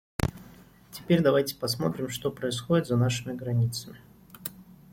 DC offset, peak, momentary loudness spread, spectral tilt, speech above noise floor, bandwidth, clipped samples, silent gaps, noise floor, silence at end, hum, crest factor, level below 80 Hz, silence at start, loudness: under 0.1%; -8 dBFS; 15 LU; -6 dB/octave; 25 dB; 16.5 kHz; under 0.1%; none; -52 dBFS; 0.3 s; none; 20 dB; -52 dBFS; 0.2 s; -28 LUFS